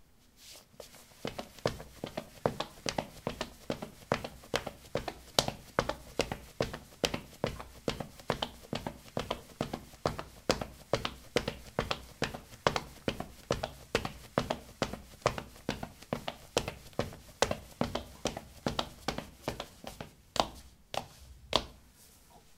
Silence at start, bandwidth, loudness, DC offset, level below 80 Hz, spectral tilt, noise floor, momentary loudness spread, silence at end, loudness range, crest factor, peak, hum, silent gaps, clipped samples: 0 s; 17.5 kHz; -37 LUFS; under 0.1%; -52 dBFS; -4 dB/octave; -59 dBFS; 11 LU; 0 s; 3 LU; 36 dB; -2 dBFS; none; none; under 0.1%